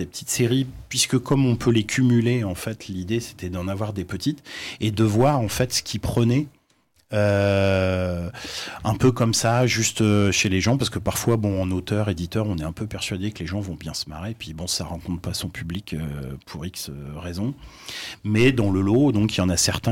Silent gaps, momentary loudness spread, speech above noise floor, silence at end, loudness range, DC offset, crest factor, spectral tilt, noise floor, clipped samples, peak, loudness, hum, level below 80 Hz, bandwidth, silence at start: none; 13 LU; 41 dB; 0 s; 9 LU; under 0.1%; 16 dB; -5 dB/octave; -63 dBFS; under 0.1%; -8 dBFS; -23 LUFS; none; -46 dBFS; 17 kHz; 0 s